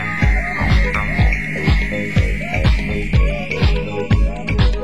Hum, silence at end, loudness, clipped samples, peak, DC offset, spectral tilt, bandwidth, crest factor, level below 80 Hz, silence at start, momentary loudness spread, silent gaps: none; 0 s; -18 LUFS; under 0.1%; -2 dBFS; 3%; -6.5 dB/octave; 11.5 kHz; 14 dB; -18 dBFS; 0 s; 3 LU; none